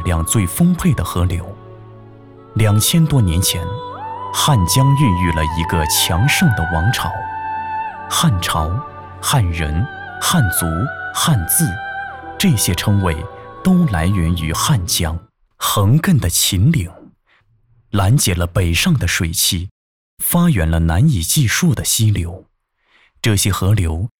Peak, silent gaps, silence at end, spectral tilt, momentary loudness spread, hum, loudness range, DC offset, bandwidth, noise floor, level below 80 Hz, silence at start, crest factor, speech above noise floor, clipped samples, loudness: -4 dBFS; 19.71-20.17 s; 0.1 s; -4.5 dB/octave; 11 LU; none; 3 LU; under 0.1%; 18.5 kHz; -59 dBFS; -30 dBFS; 0 s; 12 dB; 44 dB; under 0.1%; -16 LUFS